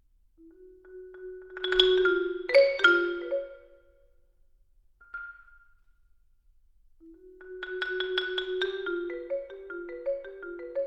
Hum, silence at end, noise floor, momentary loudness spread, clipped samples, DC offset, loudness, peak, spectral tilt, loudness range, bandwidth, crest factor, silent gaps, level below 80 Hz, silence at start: none; 0 s; -62 dBFS; 22 LU; under 0.1%; under 0.1%; -27 LUFS; -6 dBFS; -3 dB/octave; 17 LU; 7.6 kHz; 24 dB; none; -60 dBFS; 0.45 s